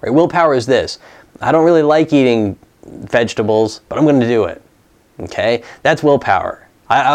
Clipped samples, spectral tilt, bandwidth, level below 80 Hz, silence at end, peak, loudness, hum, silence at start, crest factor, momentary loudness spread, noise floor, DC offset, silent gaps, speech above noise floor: under 0.1%; -6 dB/octave; 10.5 kHz; -52 dBFS; 0 s; 0 dBFS; -14 LUFS; none; 0.05 s; 14 dB; 14 LU; -52 dBFS; under 0.1%; none; 38 dB